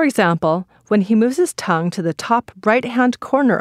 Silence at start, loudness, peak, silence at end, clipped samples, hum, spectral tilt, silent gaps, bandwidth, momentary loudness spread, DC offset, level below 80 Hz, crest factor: 0 s; -18 LUFS; -2 dBFS; 0 s; under 0.1%; none; -6 dB/octave; none; 15 kHz; 5 LU; under 0.1%; -60 dBFS; 16 dB